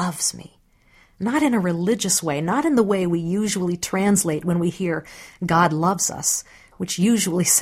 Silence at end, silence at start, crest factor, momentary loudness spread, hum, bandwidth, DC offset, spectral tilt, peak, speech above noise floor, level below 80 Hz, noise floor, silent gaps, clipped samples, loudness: 0 s; 0 s; 18 dB; 8 LU; none; 16 kHz; under 0.1%; -4 dB/octave; -4 dBFS; 35 dB; -54 dBFS; -55 dBFS; none; under 0.1%; -21 LUFS